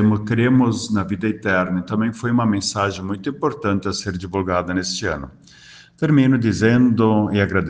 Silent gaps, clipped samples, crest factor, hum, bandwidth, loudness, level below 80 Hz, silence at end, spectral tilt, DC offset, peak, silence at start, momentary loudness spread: none; under 0.1%; 16 dB; none; 9.6 kHz; -19 LUFS; -48 dBFS; 0 s; -6 dB/octave; under 0.1%; -2 dBFS; 0 s; 9 LU